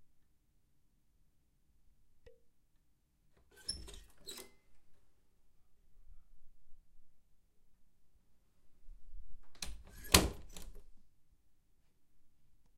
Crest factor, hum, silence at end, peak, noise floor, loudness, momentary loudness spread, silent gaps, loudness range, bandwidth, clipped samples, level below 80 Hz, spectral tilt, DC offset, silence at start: 38 dB; none; 0.1 s; -6 dBFS; -74 dBFS; -35 LUFS; 26 LU; none; 19 LU; 16 kHz; under 0.1%; -54 dBFS; -2.5 dB/octave; under 0.1%; 0 s